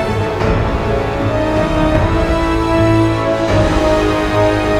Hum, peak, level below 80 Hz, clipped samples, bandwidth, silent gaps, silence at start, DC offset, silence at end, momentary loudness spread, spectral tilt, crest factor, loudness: none; 0 dBFS; -22 dBFS; under 0.1%; 13.5 kHz; none; 0 s; under 0.1%; 0 s; 4 LU; -7 dB/octave; 12 dB; -14 LUFS